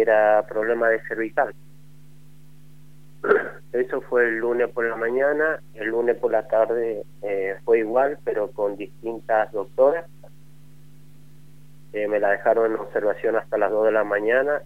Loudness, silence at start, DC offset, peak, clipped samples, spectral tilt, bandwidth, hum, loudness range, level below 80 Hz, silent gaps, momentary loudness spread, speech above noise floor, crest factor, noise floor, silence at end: -23 LUFS; 0 s; 0.8%; -4 dBFS; under 0.1%; -7 dB/octave; 15 kHz; 50 Hz at -50 dBFS; 4 LU; -66 dBFS; none; 8 LU; 28 dB; 20 dB; -50 dBFS; 0.05 s